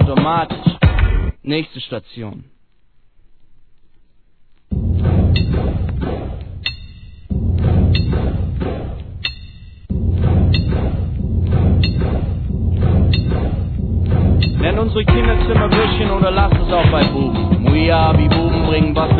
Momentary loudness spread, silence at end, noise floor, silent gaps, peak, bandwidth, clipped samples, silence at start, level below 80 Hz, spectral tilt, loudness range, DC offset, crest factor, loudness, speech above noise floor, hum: 11 LU; 0 s; -52 dBFS; none; 0 dBFS; 4.6 kHz; under 0.1%; 0 s; -22 dBFS; -10 dB/octave; 8 LU; 0.3%; 16 dB; -16 LUFS; 38 dB; none